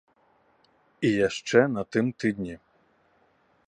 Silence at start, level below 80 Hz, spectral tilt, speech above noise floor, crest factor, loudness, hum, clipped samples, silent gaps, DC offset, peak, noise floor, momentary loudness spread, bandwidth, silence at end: 1 s; -62 dBFS; -5.5 dB/octave; 41 dB; 22 dB; -26 LUFS; none; under 0.1%; none; under 0.1%; -6 dBFS; -65 dBFS; 13 LU; 9.8 kHz; 1.1 s